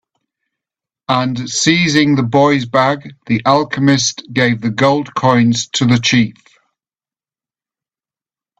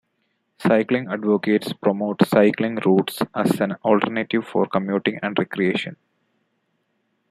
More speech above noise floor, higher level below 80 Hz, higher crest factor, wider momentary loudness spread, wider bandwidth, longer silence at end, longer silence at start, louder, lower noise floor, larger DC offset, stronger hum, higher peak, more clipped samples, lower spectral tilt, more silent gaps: first, over 76 dB vs 51 dB; first, -52 dBFS vs -64 dBFS; about the same, 16 dB vs 20 dB; about the same, 6 LU vs 6 LU; second, 9.2 kHz vs 14.5 kHz; first, 2.3 s vs 1.35 s; first, 1.1 s vs 0.6 s; first, -14 LUFS vs -21 LUFS; first, under -90 dBFS vs -71 dBFS; neither; neither; about the same, 0 dBFS vs -2 dBFS; neither; second, -4.5 dB/octave vs -6.5 dB/octave; neither